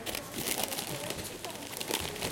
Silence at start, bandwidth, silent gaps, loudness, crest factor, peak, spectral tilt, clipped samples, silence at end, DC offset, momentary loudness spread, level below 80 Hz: 0 s; 17 kHz; none; -35 LUFS; 26 dB; -10 dBFS; -2 dB/octave; under 0.1%; 0 s; under 0.1%; 7 LU; -58 dBFS